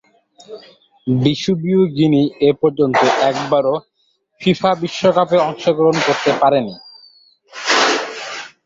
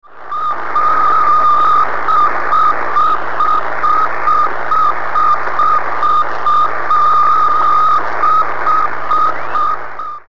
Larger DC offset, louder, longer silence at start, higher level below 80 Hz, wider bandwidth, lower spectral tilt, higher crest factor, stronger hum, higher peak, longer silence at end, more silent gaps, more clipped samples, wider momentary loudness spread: second, under 0.1% vs 20%; second, -16 LUFS vs -12 LUFS; first, 0.5 s vs 0 s; about the same, -56 dBFS vs -52 dBFS; about the same, 7.8 kHz vs 7.2 kHz; about the same, -5 dB/octave vs -4.5 dB/octave; first, 16 dB vs 8 dB; second, none vs 60 Hz at -45 dBFS; about the same, -2 dBFS vs -2 dBFS; first, 0.15 s vs 0 s; neither; neither; first, 11 LU vs 6 LU